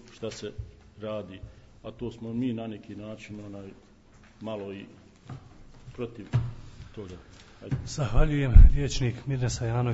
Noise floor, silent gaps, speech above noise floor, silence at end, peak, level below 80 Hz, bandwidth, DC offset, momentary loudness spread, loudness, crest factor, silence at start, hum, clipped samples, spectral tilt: -55 dBFS; none; 31 dB; 0 s; 0 dBFS; -28 dBFS; 8 kHz; under 0.1%; 23 LU; -28 LUFS; 26 dB; 0.2 s; none; under 0.1%; -6.5 dB/octave